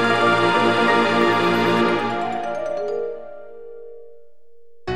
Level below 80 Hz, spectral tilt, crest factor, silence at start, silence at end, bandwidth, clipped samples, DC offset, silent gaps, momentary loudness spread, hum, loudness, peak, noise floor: -60 dBFS; -5 dB/octave; 18 dB; 0 s; 0 s; 14.5 kHz; under 0.1%; 1%; none; 22 LU; none; -19 LUFS; -2 dBFS; -55 dBFS